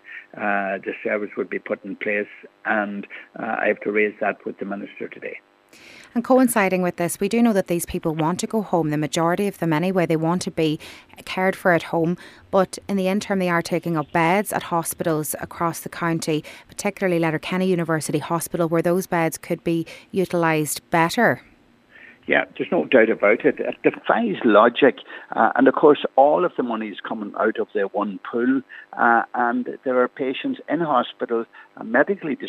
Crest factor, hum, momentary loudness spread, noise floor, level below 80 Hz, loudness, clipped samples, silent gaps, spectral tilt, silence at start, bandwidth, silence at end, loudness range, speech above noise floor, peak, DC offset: 20 dB; none; 13 LU; -52 dBFS; -60 dBFS; -21 LUFS; under 0.1%; none; -5.5 dB/octave; 0.05 s; 16 kHz; 0 s; 6 LU; 31 dB; -2 dBFS; under 0.1%